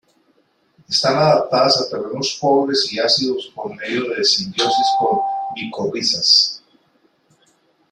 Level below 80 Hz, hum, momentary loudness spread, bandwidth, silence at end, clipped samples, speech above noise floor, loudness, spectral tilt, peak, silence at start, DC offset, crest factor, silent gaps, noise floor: -62 dBFS; none; 12 LU; 12 kHz; 1.35 s; under 0.1%; 43 dB; -17 LUFS; -3 dB/octave; -2 dBFS; 0.9 s; under 0.1%; 18 dB; none; -60 dBFS